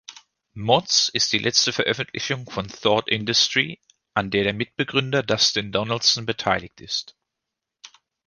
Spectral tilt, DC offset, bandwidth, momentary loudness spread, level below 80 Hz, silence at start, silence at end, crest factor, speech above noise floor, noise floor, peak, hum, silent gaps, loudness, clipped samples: -2.5 dB/octave; under 0.1%; 11 kHz; 10 LU; -56 dBFS; 0.1 s; 0.4 s; 22 dB; 61 dB; -84 dBFS; -2 dBFS; none; none; -21 LUFS; under 0.1%